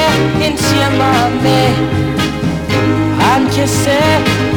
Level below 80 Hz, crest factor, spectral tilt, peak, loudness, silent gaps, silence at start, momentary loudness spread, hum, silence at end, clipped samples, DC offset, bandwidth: -32 dBFS; 10 dB; -5 dB/octave; -2 dBFS; -12 LUFS; none; 0 s; 4 LU; none; 0 s; under 0.1%; 0.2%; 19 kHz